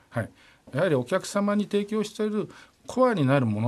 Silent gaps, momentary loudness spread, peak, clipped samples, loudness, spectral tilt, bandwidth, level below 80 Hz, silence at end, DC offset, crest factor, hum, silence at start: none; 12 LU; -10 dBFS; under 0.1%; -26 LUFS; -6.5 dB/octave; 13 kHz; -66 dBFS; 0 s; under 0.1%; 16 dB; none; 0.1 s